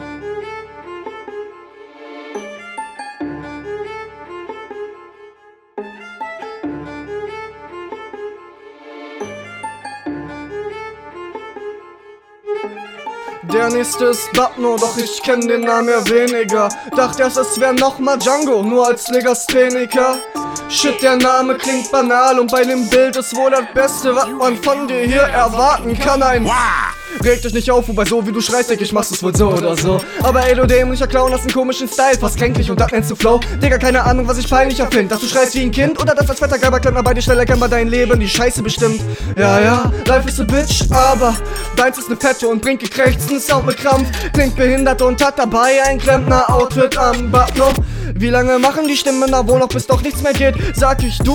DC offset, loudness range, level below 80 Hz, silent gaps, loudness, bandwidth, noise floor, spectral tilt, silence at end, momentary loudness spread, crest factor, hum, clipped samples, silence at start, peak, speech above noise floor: under 0.1%; 16 LU; -26 dBFS; none; -14 LUFS; 19 kHz; -46 dBFS; -4.5 dB/octave; 0 s; 18 LU; 14 dB; none; under 0.1%; 0 s; 0 dBFS; 33 dB